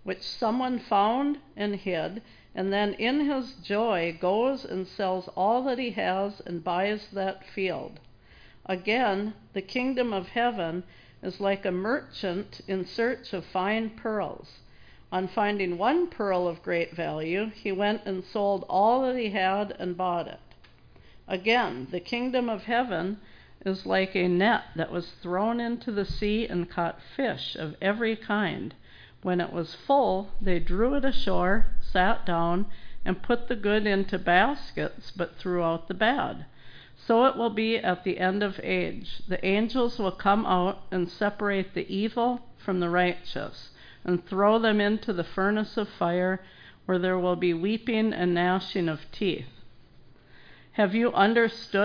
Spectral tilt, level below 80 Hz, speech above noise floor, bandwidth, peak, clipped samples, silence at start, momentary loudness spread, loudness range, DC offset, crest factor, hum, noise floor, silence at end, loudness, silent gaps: -7 dB/octave; -42 dBFS; 27 dB; 5.2 kHz; -8 dBFS; under 0.1%; 0.05 s; 10 LU; 3 LU; under 0.1%; 18 dB; none; -53 dBFS; 0 s; -28 LUFS; none